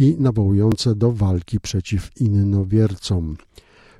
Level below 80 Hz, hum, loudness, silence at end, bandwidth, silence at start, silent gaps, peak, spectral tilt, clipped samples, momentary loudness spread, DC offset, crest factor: -40 dBFS; none; -19 LUFS; 0.6 s; 11.5 kHz; 0 s; none; -4 dBFS; -7.5 dB/octave; under 0.1%; 7 LU; under 0.1%; 14 dB